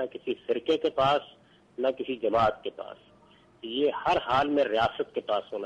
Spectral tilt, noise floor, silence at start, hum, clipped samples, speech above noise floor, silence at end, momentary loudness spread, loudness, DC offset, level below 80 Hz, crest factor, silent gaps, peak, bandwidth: -6 dB/octave; -58 dBFS; 0 s; none; under 0.1%; 31 dB; 0 s; 13 LU; -28 LUFS; under 0.1%; -58 dBFS; 16 dB; none; -14 dBFS; 9.6 kHz